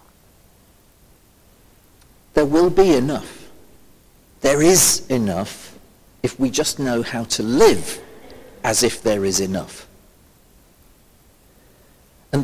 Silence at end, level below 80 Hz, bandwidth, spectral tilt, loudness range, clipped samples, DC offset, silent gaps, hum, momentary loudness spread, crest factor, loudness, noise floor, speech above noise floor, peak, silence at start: 0 s; -46 dBFS; 16 kHz; -3.5 dB/octave; 6 LU; under 0.1%; under 0.1%; none; none; 16 LU; 20 dB; -18 LUFS; -53 dBFS; 35 dB; 0 dBFS; 2.35 s